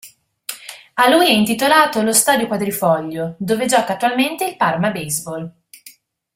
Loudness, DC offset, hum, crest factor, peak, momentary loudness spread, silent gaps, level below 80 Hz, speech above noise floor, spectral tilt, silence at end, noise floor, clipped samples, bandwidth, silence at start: -16 LUFS; under 0.1%; none; 18 dB; 0 dBFS; 17 LU; none; -58 dBFS; 30 dB; -3 dB/octave; 0.45 s; -46 dBFS; under 0.1%; 16.5 kHz; 0.05 s